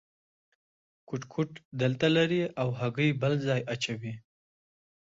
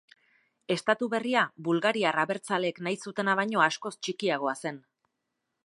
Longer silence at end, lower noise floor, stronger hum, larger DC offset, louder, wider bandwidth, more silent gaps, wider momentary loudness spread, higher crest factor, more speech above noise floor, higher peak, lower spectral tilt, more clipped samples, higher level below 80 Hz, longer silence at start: about the same, 0.85 s vs 0.85 s; first, under -90 dBFS vs -82 dBFS; neither; neither; about the same, -29 LUFS vs -28 LUFS; second, 7.8 kHz vs 11.5 kHz; first, 1.65-1.71 s vs none; first, 14 LU vs 9 LU; about the same, 18 dB vs 22 dB; first, over 61 dB vs 54 dB; second, -14 dBFS vs -8 dBFS; first, -6 dB/octave vs -4.5 dB/octave; neither; first, -68 dBFS vs -82 dBFS; first, 1.1 s vs 0.7 s